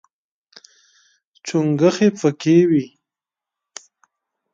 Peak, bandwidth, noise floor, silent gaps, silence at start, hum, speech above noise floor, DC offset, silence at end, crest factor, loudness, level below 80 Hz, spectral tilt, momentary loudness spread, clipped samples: -2 dBFS; 7.8 kHz; -88 dBFS; none; 1.45 s; none; 72 dB; under 0.1%; 1.65 s; 18 dB; -17 LUFS; -66 dBFS; -6.5 dB/octave; 25 LU; under 0.1%